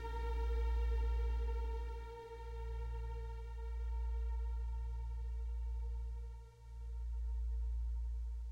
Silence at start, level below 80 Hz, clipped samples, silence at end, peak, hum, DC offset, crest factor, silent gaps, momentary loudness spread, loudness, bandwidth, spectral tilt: 0 s; -40 dBFS; under 0.1%; 0 s; -30 dBFS; none; under 0.1%; 10 dB; none; 11 LU; -43 LUFS; 5.4 kHz; -7 dB/octave